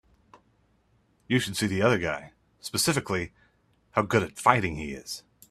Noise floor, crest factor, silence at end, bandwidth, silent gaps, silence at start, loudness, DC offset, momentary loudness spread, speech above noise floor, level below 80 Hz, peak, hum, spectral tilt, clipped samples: -66 dBFS; 28 dB; 0.3 s; 15.5 kHz; none; 1.3 s; -27 LUFS; under 0.1%; 14 LU; 40 dB; -56 dBFS; -2 dBFS; none; -4.5 dB/octave; under 0.1%